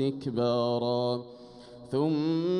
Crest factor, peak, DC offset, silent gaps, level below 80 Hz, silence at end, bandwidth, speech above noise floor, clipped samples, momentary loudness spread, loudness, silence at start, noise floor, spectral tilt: 12 dB; -16 dBFS; under 0.1%; none; -68 dBFS; 0 s; 10.5 kHz; 20 dB; under 0.1%; 21 LU; -29 LUFS; 0 s; -48 dBFS; -8 dB/octave